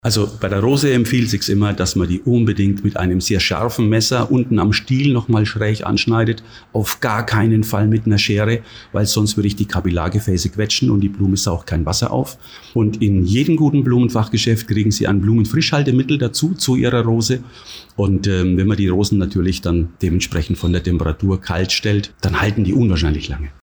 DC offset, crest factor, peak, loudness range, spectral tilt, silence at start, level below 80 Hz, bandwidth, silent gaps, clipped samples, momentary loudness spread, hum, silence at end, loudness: under 0.1%; 10 dB; -6 dBFS; 2 LU; -5.5 dB/octave; 0.05 s; -34 dBFS; over 20 kHz; none; under 0.1%; 5 LU; none; 0.1 s; -17 LUFS